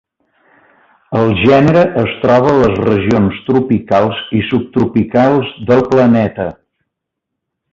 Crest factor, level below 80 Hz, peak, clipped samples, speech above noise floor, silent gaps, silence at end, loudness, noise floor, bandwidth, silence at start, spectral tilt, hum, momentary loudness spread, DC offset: 12 dB; -40 dBFS; 0 dBFS; under 0.1%; 65 dB; none; 1.2 s; -12 LUFS; -77 dBFS; 7.4 kHz; 1.1 s; -8 dB/octave; none; 6 LU; under 0.1%